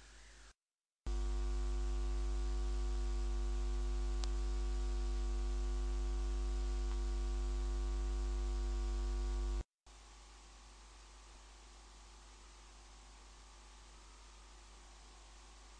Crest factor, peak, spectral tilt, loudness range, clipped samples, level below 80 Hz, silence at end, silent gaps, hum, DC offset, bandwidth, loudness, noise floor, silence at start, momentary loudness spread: 18 dB; -22 dBFS; -5.5 dB/octave; 17 LU; under 0.1%; -40 dBFS; 0 s; 9.74-9.78 s; none; under 0.1%; 9.6 kHz; -42 LUFS; under -90 dBFS; 0 s; 17 LU